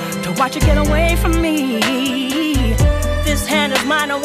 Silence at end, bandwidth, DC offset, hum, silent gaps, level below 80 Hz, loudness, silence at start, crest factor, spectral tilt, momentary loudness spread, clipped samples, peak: 0 s; 15.5 kHz; under 0.1%; none; none; -22 dBFS; -16 LUFS; 0 s; 12 dB; -4.5 dB/octave; 3 LU; under 0.1%; -2 dBFS